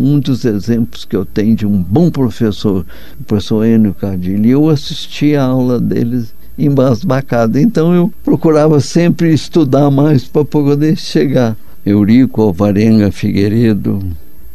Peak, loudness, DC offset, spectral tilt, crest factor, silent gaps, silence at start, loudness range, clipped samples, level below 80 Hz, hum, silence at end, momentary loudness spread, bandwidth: 0 dBFS; -12 LUFS; 7%; -7.5 dB/octave; 12 dB; none; 0 s; 3 LU; under 0.1%; -38 dBFS; none; 0.35 s; 8 LU; 13.5 kHz